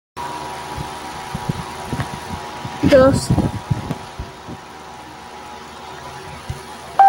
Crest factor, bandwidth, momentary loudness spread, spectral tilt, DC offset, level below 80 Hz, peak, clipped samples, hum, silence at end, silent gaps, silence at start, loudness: 18 dB; 17 kHz; 20 LU; -6 dB/octave; under 0.1%; -40 dBFS; -2 dBFS; under 0.1%; none; 0 s; none; 0.15 s; -21 LUFS